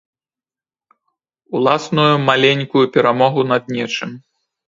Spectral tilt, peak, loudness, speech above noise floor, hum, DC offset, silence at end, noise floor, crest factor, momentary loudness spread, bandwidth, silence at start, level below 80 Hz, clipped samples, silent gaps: -5.5 dB/octave; 0 dBFS; -15 LUFS; over 75 dB; none; under 0.1%; 0.55 s; under -90 dBFS; 18 dB; 10 LU; 7.8 kHz; 1.5 s; -62 dBFS; under 0.1%; none